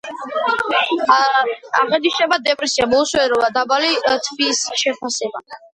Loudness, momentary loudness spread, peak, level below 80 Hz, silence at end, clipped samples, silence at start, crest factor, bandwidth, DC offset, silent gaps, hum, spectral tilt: -17 LUFS; 8 LU; 0 dBFS; -56 dBFS; 0.2 s; under 0.1%; 0.05 s; 18 dB; 11.5 kHz; under 0.1%; none; none; -1 dB/octave